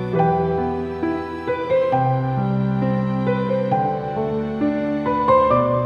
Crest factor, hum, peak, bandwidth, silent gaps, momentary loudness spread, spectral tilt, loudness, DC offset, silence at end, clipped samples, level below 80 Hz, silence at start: 16 dB; none; -4 dBFS; 6.2 kHz; none; 8 LU; -9.5 dB/octave; -20 LUFS; under 0.1%; 0 s; under 0.1%; -48 dBFS; 0 s